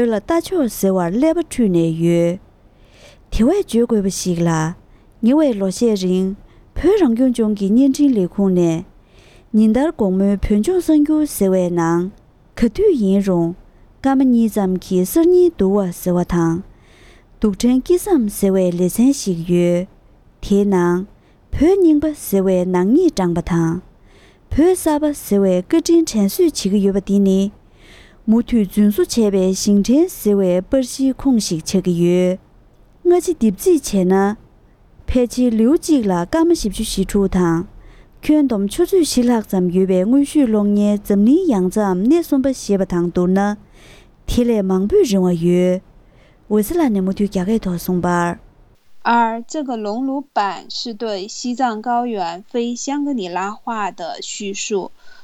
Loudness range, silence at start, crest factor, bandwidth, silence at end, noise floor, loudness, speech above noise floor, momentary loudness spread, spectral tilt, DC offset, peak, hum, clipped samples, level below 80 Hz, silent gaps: 4 LU; 0 s; 14 dB; 16 kHz; 0 s; -49 dBFS; -17 LUFS; 33 dB; 9 LU; -6.5 dB/octave; under 0.1%; -4 dBFS; none; under 0.1%; -38 dBFS; none